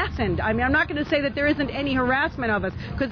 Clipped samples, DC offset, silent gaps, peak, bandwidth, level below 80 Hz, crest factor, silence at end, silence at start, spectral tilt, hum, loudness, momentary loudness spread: under 0.1%; under 0.1%; none; -10 dBFS; 5.4 kHz; -38 dBFS; 14 dB; 0 s; 0 s; -7.5 dB/octave; none; -23 LUFS; 4 LU